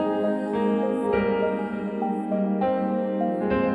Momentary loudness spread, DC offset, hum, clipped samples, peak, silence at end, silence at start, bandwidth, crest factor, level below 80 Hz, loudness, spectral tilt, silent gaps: 4 LU; under 0.1%; none; under 0.1%; -10 dBFS; 0 s; 0 s; 10 kHz; 14 dB; -52 dBFS; -25 LUFS; -9 dB/octave; none